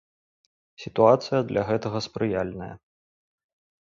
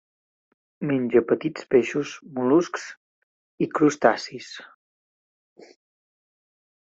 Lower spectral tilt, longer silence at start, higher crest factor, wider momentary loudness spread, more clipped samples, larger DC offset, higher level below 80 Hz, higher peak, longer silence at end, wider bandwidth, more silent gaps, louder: about the same, -6.5 dB/octave vs -5.5 dB/octave; about the same, 0.8 s vs 0.8 s; about the same, 22 dB vs 24 dB; about the same, 18 LU vs 16 LU; neither; neither; first, -56 dBFS vs -68 dBFS; about the same, -4 dBFS vs -2 dBFS; second, 1.1 s vs 2.2 s; about the same, 7.4 kHz vs 7.8 kHz; second, none vs 2.97-3.58 s; about the same, -24 LUFS vs -23 LUFS